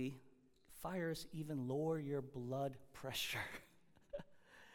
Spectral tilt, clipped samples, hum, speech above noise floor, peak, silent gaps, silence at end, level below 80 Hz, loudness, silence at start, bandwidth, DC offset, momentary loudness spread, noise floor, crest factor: -5 dB/octave; under 0.1%; none; 22 dB; -30 dBFS; none; 0 s; -70 dBFS; -45 LUFS; 0 s; 18 kHz; under 0.1%; 16 LU; -66 dBFS; 16 dB